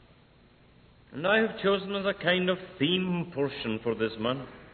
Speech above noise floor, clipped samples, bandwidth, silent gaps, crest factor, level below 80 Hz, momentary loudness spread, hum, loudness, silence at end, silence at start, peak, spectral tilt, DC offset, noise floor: 30 dB; under 0.1%; 4.5 kHz; none; 18 dB; -60 dBFS; 7 LU; none; -29 LUFS; 0.05 s; 1.1 s; -12 dBFS; -9 dB/octave; under 0.1%; -59 dBFS